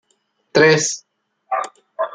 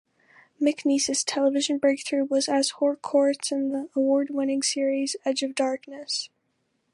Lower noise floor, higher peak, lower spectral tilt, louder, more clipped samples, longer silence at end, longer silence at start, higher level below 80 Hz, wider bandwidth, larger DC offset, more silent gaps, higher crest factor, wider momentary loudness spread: second, -66 dBFS vs -73 dBFS; first, -2 dBFS vs -10 dBFS; first, -3.5 dB/octave vs -1.5 dB/octave; first, -17 LUFS vs -25 LUFS; neither; second, 0.05 s vs 0.65 s; about the same, 0.55 s vs 0.6 s; first, -62 dBFS vs -78 dBFS; second, 9.6 kHz vs 11.5 kHz; neither; neither; about the same, 18 dB vs 16 dB; first, 16 LU vs 5 LU